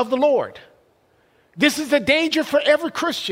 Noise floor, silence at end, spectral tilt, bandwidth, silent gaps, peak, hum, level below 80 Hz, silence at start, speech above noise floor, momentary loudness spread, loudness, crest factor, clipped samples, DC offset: -60 dBFS; 0 s; -3 dB/octave; 16 kHz; none; -2 dBFS; none; -58 dBFS; 0 s; 40 dB; 6 LU; -19 LUFS; 18 dB; under 0.1%; under 0.1%